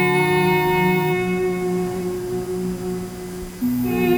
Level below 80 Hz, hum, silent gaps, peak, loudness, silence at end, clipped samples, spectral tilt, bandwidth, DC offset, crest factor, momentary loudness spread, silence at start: -44 dBFS; none; none; -6 dBFS; -21 LUFS; 0 s; under 0.1%; -6 dB/octave; over 20 kHz; under 0.1%; 14 dB; 11 LU; 0 s